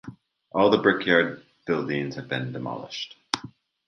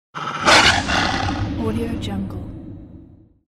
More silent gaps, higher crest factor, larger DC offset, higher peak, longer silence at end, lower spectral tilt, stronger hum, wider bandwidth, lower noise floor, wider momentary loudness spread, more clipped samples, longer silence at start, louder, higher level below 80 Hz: neither; first, 26 dB vs 20 dB; neither; about the same, 0 dBFS vs -2 dBFS; about the same, 0.4 s vs 0.45 s; first, -5 dB/octave vs -3.5 dB/octave; neither; second, 11.5 kHz vs 15 kHz; about the same, -46 dBFS vs -46 dBFS; second, 15 LU vs 22 LU; neither; about the same, 0.05 s vs 0.15 s; second, -25 LUFS vs -18 LUFS; second, -62 dBFS vs -36 dBFS